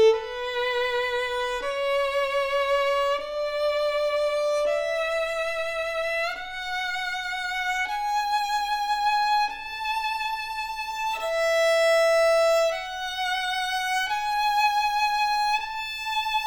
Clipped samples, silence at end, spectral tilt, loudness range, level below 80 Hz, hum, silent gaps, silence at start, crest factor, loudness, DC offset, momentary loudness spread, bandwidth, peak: under 0.1%; 0 s; 0.5 dB/octave; 4 LU; -54 dBFS; none; none; 0 s; 14 dB; -25 LUFS; under 0.1%; 8 LU; over 20 kHz; -10 dBFS